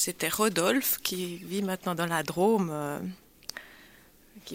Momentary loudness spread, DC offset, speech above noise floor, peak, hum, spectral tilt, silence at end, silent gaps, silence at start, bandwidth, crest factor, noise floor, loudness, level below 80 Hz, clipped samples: 16 LU; under 0.1%; 28 dB; -12 dBFS; none; -3.5 dB/octave; 0 s; none; 0 s; 16.5 kHz; 18 dB; -57 dBFS; -28 LUFS; -64 dBFS; under 0.1%